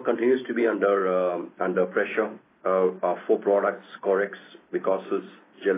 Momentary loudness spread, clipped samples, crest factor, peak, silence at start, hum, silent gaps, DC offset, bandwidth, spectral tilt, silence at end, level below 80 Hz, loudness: 9 LU; under 0.1%; 16 dB; -10 dBFS; 0 s; none; none; under 0.1%; 3.9 kHz; -10 dB/octave; 0 s; -86 dBFS; -25 LUFS